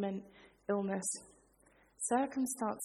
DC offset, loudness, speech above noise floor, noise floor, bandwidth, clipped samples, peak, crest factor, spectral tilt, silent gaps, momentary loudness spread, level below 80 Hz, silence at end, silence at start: under 0.1%; -37 LUFS; 31 dB; -68 dBFS; 13.5 kHz; under 0.1%; -20 dBFS; 18 dB; -4.5 dB/octave; none; 11 LU; -76 dBFS; 0 s; 0 s